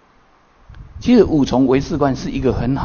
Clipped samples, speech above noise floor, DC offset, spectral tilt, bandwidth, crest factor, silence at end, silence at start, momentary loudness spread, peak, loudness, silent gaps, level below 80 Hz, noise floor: under 0.1%; 37 dB; under 0.1%; -7.5 dB/octave; 7 kHz; 16 dB; 0 s; 0.7 s; 7 LU; 0 dBFS; -16 LUFS; none; -34 dBFS; -52 dBFS